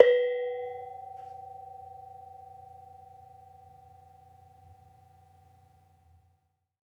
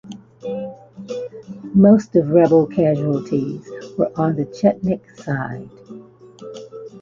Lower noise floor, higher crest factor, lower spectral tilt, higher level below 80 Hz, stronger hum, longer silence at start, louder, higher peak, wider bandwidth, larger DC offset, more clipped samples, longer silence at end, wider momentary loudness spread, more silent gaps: first, -74 dBFS vs -41 dBFS; first, 32 dB vs 18 dB; second, -4.5 dB/octave vs -9 dB/octave; second, -76 dBFS vs -54 dBFS; neither; about the same, 0 s vs 0.05 s; second, -32 LUFS vs -18 LUFS; about the same, -2 dBFS vs 0 dBFS; second, 4.8 kHz vs 7.4 kHz; neither; neither; first, 4.55 s vs 0.05 s; about the same, 25 LU vs 23 LU; neither